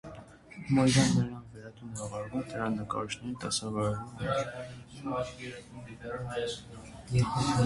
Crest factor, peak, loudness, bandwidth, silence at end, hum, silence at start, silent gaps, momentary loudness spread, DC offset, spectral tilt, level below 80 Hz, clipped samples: 22 dB; -10 dBFS; -32 LUFS; 11.5 kHz; 0 s; none; 0.05 s; none; 20 LU; under 0.1%; -5.5 dB/octave; -54 dBFS; under 0.1%